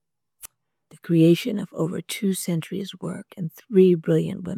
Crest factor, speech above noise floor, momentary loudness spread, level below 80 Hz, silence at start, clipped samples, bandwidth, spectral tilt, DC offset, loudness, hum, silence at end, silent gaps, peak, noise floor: 18 dB; 33 dB; 16 LU; -66 dBFS; 0.45 s; under 0.1%; 16 kHz; -6.5 dB/octave; under 0.1%; -22 LUFS; none; 0 s; none; -6 dBFS; -55 dBFS